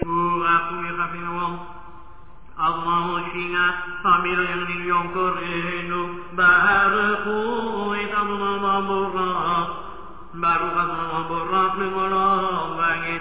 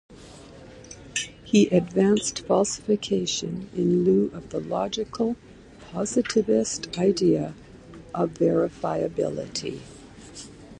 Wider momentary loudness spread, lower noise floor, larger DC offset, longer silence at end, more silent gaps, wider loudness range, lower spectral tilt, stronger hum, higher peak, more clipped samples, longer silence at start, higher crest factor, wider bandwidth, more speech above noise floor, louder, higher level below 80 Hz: second, 9 LU vs 22 LU; about the same, -46 dBFS vs -45 dBFS; first, 1% vs under 0.1%; about the same, 0 s vs 0 s; neither; about the same, 4 LU vs 3 LU; first, -8.5 dB/octave vs -5 dB/octave; neither; about the same, -4 dBFS vs -6 dBFS; neither; about the same, 0 s vs 0.1 s; about the same, 18 dB vs 18 dB; second, 4 kHz vs 11 kHz; about the same, 25 dB vs 22 dB; first, -22 LUFS vs -25 LUFS; first, -48 dBFS vs -54 dBFS